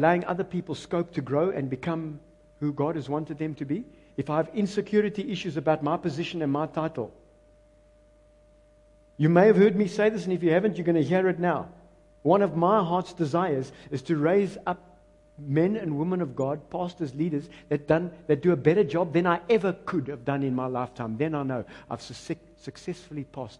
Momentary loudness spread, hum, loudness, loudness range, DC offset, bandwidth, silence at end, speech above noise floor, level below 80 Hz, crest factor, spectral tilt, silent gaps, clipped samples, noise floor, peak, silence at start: 14 LU; none; -26 LUFS; 7 LU; under 0.1%; 10.5 kHz; 0.05 s; 32 dB; -60 dBFS; 20 dB; -7.5 dB/octave; none; under 0.1%; -58 dBFS; -6 dBFS; 0 s